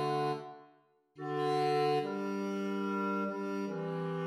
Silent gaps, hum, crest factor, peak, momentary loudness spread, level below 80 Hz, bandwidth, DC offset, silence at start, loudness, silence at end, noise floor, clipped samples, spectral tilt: none; none; 14 dB; -22 dBFS; 8 LU; -84 dBFS; 13.5 kHz; under 0.1%; 0 s; -34 LUFS; 0 s; -67 dBFS; under 0.1%; -7 dB/octave